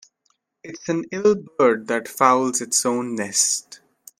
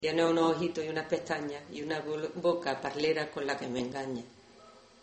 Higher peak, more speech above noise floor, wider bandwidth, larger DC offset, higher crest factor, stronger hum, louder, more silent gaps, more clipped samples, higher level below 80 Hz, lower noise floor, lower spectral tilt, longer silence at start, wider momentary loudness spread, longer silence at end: first, 0 dBFS vs -14 dBFS; first, 48 dB vs 24 dB; first, 16 kHz vs 8.4 kHz; neither; about the same, 22 dB vs 18 dB; neither; first, -20 LUFS vs -33 LUFS; neither; neither; about the same, -68 dBFS vs -70 dBFS; first, -69 dBFS vs -56 dBFS; second, -2.5 dB/octave vs -5 dB/octave; first, 0.65 s vs 0 s; about the same, 9 LU vs 11 LU; first, 0.45 s vs 0.25 s